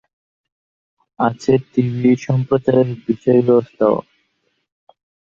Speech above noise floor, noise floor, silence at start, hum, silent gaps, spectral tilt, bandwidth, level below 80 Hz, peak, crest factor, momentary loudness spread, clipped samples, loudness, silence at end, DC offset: 52 dB; -68 dBFS; 1.2 s; none; none; -8.5 dB/octave; 7.4 kHz; -56 dBFS; -2 dBFS; 16 dB; 6 LU; under 0.1%; -17 LUFS; 1.3 s; under 0.1%